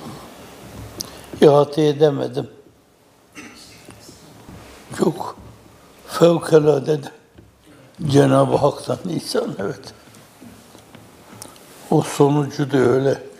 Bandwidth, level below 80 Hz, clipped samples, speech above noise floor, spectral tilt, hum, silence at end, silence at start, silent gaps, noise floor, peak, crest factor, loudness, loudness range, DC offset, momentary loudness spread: 16 kHz; -54 dBFS; under 0.1%; 37 dB; -6.5 dB/octave; none; 0.1 s; 0 s; none; -54 dBFS; 0 dBFS; 20 dB; -18 LUFS; 11 LU; under 0.1%; 24 LU